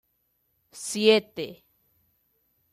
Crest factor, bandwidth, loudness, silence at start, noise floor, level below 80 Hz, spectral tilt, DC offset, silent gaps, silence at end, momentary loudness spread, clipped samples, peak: 22 dB; 13 kHz; -24 LUFS; 0.75 s; -73 dBFS; -74 dBFS; -3 dB/octave; under 0.1%; none; 1.2 s; 17 LU; under 0.1%; -8 dBFS